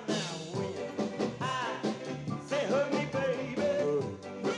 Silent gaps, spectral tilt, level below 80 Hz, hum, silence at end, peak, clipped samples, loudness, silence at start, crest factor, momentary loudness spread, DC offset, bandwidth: none; -5 dB/octave; -70 dBFS; none; 0 s; -18 dBFS; under 0.1%; -33 LUFS; 0 s; 14 dB; 7 LU; under 0.1%; 11.5 kHz